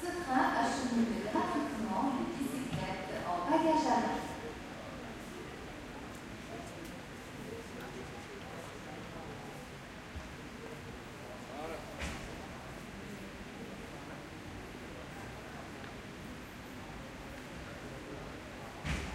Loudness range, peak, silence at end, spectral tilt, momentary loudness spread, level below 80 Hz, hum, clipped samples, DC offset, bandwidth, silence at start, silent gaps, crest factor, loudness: 12 LU; -16 dBFS; 0 s; -5 dB/octave; 15 LU; -54 dBFS; none; under 0.1%; under 0.1%; 16 kHz; 0 s; none; 22 dB; -39 LUFS